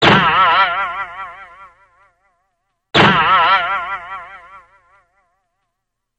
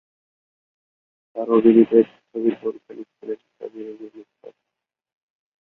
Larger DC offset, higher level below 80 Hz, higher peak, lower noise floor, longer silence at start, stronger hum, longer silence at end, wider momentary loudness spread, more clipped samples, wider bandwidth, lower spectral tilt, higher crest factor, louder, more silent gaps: neither; first, -48 dBFS vs -70 dBFS; about the same, 0 dBFS vs -2 dBFS; second, -76 dBFS vs -84 dBFS; second, 0 s vs 1.35 s; neither; first, 1.6 s vs 1.1 s; second, 20 LU vs 24 LU; neither; first, 9 kHz vs 4 kHz; second, -5 dB/octave vs -10 dB/octave; about the same, 18 dB vs 20 dB; first, -13 LUFS vs -18 LUFS; neither